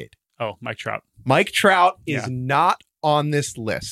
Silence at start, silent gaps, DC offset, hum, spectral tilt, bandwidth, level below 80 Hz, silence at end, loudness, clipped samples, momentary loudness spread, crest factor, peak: 0 s; none; under 0.1%; none; -4.5 dB/octave; 15.5 kHz; -58 dBFS; 0 s; -21 LUFS; under 0.1%; 14 LU; 18 dB; -4 dBFS